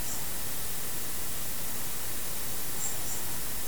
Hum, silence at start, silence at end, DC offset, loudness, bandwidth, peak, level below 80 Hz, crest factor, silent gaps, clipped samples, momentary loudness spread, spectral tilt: none; 0 s; 0 s; 3%; -33 LUFS; over 20 kHz; -18 dBFS; -50 dBFS; 14 dB; none; under 0.1%; 1 LU; -1.5 dB/octave